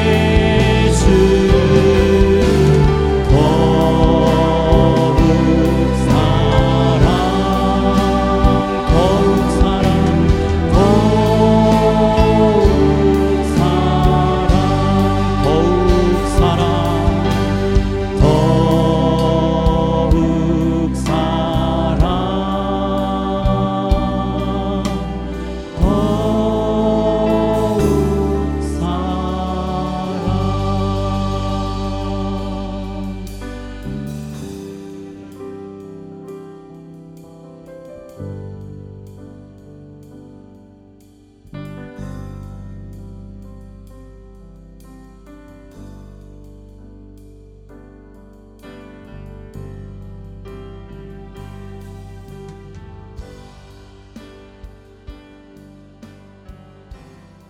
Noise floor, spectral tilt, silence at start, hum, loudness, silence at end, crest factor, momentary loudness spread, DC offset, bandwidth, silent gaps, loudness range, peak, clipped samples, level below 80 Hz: -46 dBFS; -7 dB/octave; 0 s; none; -15 LUFS; 0.45 s; 16 dB; 23 LU; under 0.1%; 15 kHz; none; 23 LU; 0 dBFS; under 0.1%; -24 dBFS